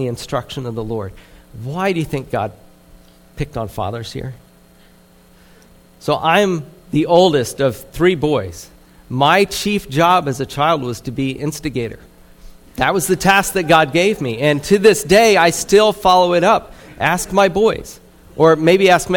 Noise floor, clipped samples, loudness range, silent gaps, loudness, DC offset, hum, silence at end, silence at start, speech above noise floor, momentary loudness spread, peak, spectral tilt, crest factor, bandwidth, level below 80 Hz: -48 dBFS; under 0.1%; 12 LU; none; -15 LUFS; under 0.1%; none; 0 s; 0 s; 33 dB; 15 LU; 0 dBFS; -4.5 dB/octave; 16 dB; 19 kHz; -42 dBFS